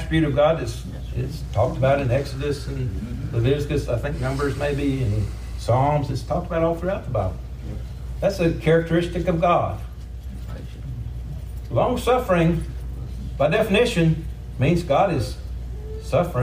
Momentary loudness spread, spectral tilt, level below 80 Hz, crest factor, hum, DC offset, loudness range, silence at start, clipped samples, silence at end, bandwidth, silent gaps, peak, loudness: 15 LU; -7 dB/octave; -32 dBFS; 16 dB; none; under 0.1%; 3 LU; 0 s; under 0.1%; 0 s; 15.5 kHz; none; -6 dBFS; -23 LUFS